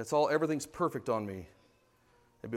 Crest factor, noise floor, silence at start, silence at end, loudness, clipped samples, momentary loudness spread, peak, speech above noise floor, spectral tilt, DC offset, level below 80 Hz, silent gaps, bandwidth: 18 dB; -68 dBFS; 0 s; 0 s; -33 LUFS; under 0.1%; 16 LU; -16 dBFS; 36 dB; -5.5 dB/octave; under 0.1%; -68 dBFS; none; 16 kHz